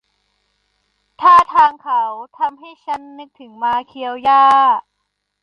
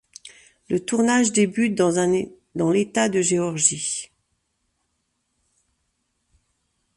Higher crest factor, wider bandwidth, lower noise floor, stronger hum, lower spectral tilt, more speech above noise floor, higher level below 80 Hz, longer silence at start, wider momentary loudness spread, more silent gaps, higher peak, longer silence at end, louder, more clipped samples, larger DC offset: second, 16 dB vs 24 dB; about the same, 10.5 kHz vs 11.5 kHz; about the same, -73 dBFS vs -74 dBFS; first, 50 Hz at -75 dBFS vs none; about the same, -3 dB/octave vs -4 dB/octave; about the same, 56 dB vs 53 dB; about the same, -60 dBFS vs -62 dBFS; first, 1.2 s vs 0.7 s; first, 17 LU vs 10 LU; neither; about the same, -2 dBFS vs 0 dBFS; second, 0.65 s vs 2.9 s; first, -14 LUFS vs -21 LUFS; neither; neither